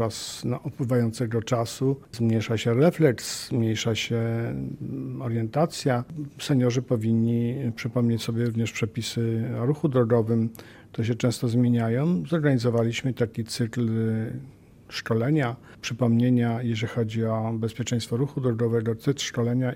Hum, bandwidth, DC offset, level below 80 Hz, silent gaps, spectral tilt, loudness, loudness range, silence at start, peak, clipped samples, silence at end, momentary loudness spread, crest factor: none; 16 kHz; under 0.1%; -58 dBFS; none; -6.5 dB/octave; -26 LUFS; 2 LU; 0 s; -6 dBFS; under 0.1%; 0 s; 8 LU; 18 dB